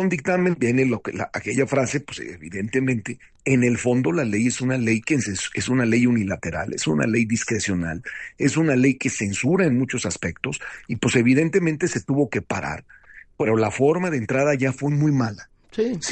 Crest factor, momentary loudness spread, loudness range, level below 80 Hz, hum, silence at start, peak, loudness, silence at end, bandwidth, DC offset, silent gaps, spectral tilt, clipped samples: 16 dB; 10 LU; 2 LU; -54 dBFS; none; 0 s; -6 dBFS; -22 LUFS; 0 s; 9.4 kHz; under 0.1%; none; -5.5 dB/octave; under 0.1%